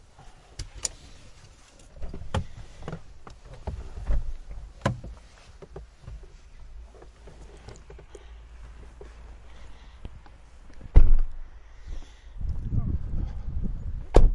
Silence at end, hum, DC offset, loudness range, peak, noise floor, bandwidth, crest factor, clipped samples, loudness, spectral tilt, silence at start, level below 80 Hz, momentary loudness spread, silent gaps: 0 s; none; under 0.1%; 18 LU; 0 dBFS; -51 dBFS; 11 kHz; 26 dB; under 0.1%; -32 LUFS; -6 dB/octave; 0.6 s; -28 dBFS; 21 LU; none